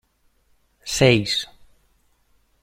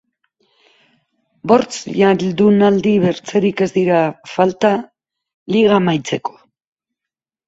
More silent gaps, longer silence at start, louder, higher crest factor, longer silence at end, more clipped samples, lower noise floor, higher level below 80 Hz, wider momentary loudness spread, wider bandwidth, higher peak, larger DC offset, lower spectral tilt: second, none vs 5.34-5.46 s; second, 0.85 s vs 1.45 s; second, -19 LUFS vs -15 LUFS; first, 22 dB vs 16 dB; about the same, 1.15 s vs 1.2 s; neither; second, -63 dBFS vs -86 dBFS; first, -50 dBFS vs -58 dBFS; first, 21 LU vs 10 LU; first, 16 kHz vs 8 kHz; about the same, -2 dBFS vs 0 dBFS; neither; second, -4.5 dB/octave vs -6.5 dB/octave